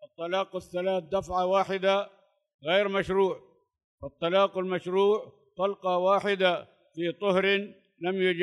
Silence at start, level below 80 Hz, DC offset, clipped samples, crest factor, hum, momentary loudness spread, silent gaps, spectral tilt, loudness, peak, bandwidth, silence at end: 0 s; -62 dBFS; under 0.1%; under 0.1%; 16 dB; none; 12 LU; 2.54-2.59 s, 3.84-3.98 s; -5.5 dB/octave; -27 LUFS; -12 dBFS; 11.5 kHz; 0 s